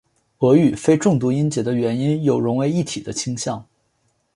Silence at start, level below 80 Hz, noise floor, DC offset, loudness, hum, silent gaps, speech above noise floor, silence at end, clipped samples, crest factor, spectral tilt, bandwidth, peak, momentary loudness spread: 0.4 s; -56 dBFS; -67 dBFS; under 0.1%; -19 LUFS; none; none; 48 dB; 0.75 s; under 0.1%; 16 dB; -6.5 dB/octave; 11.5 kHz; -2 dBFS; 10 LU